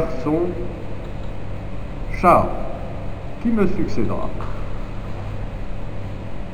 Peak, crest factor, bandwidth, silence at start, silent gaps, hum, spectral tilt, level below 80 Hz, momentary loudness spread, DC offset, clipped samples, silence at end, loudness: 0 dBFS; 20 dB; 13 kHz; 0 s; none; none; -8 dB/octave; -30 dBFS; 15 LU; 4%; under 0.1%; 0 s; -24 LUFS